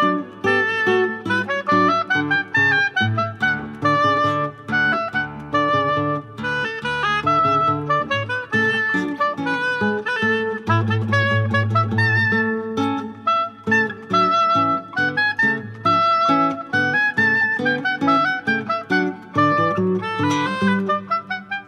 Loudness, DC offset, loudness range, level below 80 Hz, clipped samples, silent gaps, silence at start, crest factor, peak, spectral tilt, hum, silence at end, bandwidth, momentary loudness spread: -19 LUFS; under 0.1%; 2 LU; -56 dBFS; under 0.1%; none; 0 s; 14 dB; -6 dBFS; -6 dB/octave; none; 0.05 s; 10 kHz; 6 LU